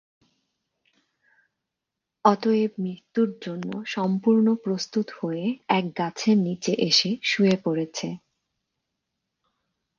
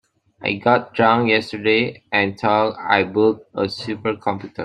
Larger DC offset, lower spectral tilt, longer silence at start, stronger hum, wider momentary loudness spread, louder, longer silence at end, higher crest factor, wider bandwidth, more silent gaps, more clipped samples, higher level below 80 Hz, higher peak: neither; second, -5 dB/octave vs -6.5 dB/octave; first, 2.25 s vs 0.4 s; neither; first, 12 LU vs 9 LU; second, -24 LUFS vs -19 LUFS; first, 1.8 s vs 0 s; first, 24 dB vs 18 dB; second, 7.4 kHz vs 10 kHz; neither; neither; second, -72 dBFS vs -60 dBFS; about the same, -2 dBFS vs -2 dBFS